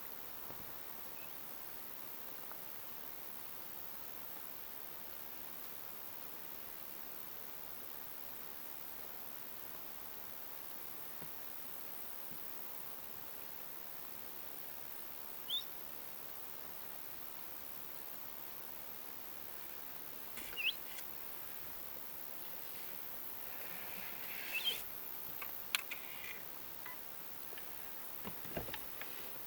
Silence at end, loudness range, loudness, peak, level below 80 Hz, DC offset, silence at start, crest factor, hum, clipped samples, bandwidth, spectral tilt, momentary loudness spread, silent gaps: 0 s; 4 LU; -43 LUFS; -14 dBFS; -72 dBFS; under 0.1%; 0 s; 32 dB; none; under 0.1%; over 20 kHz; -1.5 dB/octave; 5 LU; none